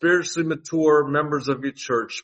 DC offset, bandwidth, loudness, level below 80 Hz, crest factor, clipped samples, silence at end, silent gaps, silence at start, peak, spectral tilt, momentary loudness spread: under 0.1%; 8.4 kHz; -22 LUFS; -66 dBFS; 16 dB; under 0.1%; 0.05 s; none; 0 s; -6 dBFS; -5 dB/octave; 7 LU